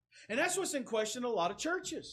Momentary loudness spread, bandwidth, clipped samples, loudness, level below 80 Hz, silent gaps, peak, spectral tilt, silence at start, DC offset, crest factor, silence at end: 4 LU; 15 kHz; under 0.1%; -35 LUFS; -74 dBFS; none; -18 dBFS; -2 dB/octave; 0.15 s; under 0.1%; 16 dB; 0 s